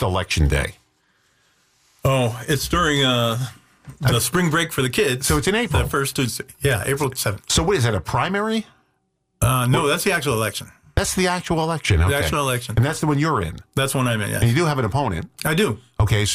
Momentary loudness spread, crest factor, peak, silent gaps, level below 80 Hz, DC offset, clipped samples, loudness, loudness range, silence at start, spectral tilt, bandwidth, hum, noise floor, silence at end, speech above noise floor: 6 LU; 14 dB; -6 dBFS; none; -36 dBFS; under 0.1%; under 0.1%; -20 LUFS; 2 LU; 0 s; -4.5 dB/octave; 16 kHz; none; -70 dBFS; 0 s; 50 dB